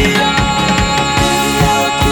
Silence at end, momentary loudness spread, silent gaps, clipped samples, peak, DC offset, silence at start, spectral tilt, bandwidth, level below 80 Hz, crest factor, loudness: 0 s; 1 LU; none; under 0.1%; 0 dBFS; under 0.1%; 0 s; -4 dB/octave; over 20 kHz; -24 dBFS; 12 dB; -12 LUFS